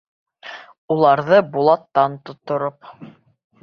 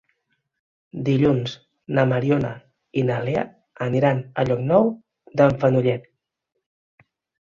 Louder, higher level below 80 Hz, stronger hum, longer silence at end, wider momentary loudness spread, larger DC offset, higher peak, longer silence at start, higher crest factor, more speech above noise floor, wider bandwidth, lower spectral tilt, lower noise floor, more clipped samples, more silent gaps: first, -18 LUFS vs -22 LUFS; second, -66 dBFS vs -54 dBFS; neither; second, 0.55 s vs 1.45 s; first, 22 LU vs 13 LU; neither; about the same, -2 dBFS vs -4 dBFS; second, 0.45 s vs 0.95 s; about the same, 18 dB vs 18 dB; second, 21 dB vs 53 dB; second, 6.4 kHz vs 7.2 kHz; about the same, -8 dB/octave vs -8.5 dB/octave; second, -39 dBFS vs -73 dBFS; neither; first, 0.78-0.88 s vs none